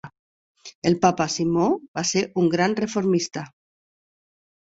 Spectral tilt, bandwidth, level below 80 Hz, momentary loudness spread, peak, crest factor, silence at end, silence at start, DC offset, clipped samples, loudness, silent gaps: -5 dB/octave; 8 kHz; -60 dBFS; 7 LU; -2 dBFS; 22 dB; 1.2 s; 0.05 s; under 0.1%; under 0.1%; -22 LUFS; 0.19-0.55 s, 0.75-0.82 s, 1.88-1.94 s